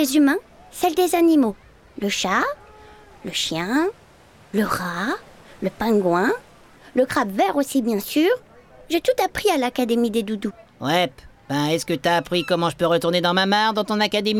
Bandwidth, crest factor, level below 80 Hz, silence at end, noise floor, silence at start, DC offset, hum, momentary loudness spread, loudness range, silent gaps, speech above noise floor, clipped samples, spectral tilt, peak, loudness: 18.5 kHz; 16 dB; -54 dBFS; 0 s; -50 dBFS; 0 s; under 0.1%; none; 10 LU; 4 LU; none; 30 dB; under 0.1%; -4.5 dB/octave; -6 dBFS; -21 LUFS